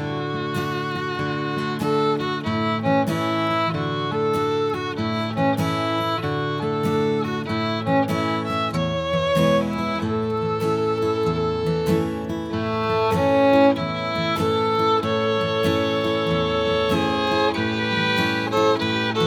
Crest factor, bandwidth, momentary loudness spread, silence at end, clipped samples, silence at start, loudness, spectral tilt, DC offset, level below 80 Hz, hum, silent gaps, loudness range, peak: 16 dB; 18 kHz; 6 LU; 0 s; under 0.1%; 0 s; -22 LUFS; -6 dB/octave; under 0.1%; -50 dBFS; none; none; 3 LU; -6 dBFS